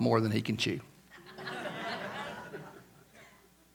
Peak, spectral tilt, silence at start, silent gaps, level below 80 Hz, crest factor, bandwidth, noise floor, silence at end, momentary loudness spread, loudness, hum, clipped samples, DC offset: -12 dBFS; -5.5 dB/octave; 0 s; none; -70 dBFS; 24 dB; 19 kHz; -61 dBFS; 0.45 s; 25 LU; -35 LUFS; none; under 0.1%; under 0.1%